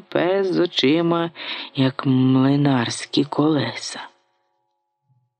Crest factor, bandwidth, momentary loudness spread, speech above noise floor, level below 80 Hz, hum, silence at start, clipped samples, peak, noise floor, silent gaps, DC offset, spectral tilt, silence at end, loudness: 18 dB; 9.6 kHz; 10 LU; 54 dB; -68 dBFS; none; 0.1 s; under 0.1%; -4 dBFS; -73 dBFS; none; under 0.1%; -6 dB/octave; 1.3 s; -20 LUFS